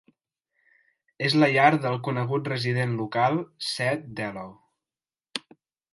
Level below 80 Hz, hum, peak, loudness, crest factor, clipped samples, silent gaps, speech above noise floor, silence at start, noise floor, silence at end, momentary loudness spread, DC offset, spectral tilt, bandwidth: -70 dBFS; none; -6 dBFS; -25 LUFS; 22 dB; under 0.1%; none; over 65 dB; 1.2 s; under -90 dBFS; 0.55 s; 16 LU; under 0.1%; -6 dB/octave; 11.5 kHz